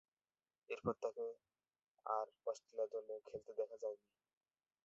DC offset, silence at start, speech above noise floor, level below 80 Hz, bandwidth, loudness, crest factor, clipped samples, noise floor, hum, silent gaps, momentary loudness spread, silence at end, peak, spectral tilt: under 0.1%; 0.7 s; over 45 dB; -80 dBFS; 7.6 kHz; -46 LUFS; 22 dB; under 0.1%; under -90 dBFS; none; 1.90-1.94 s; 8 LU; 0.9 s; -26 dBFS; -5.5 dB/octave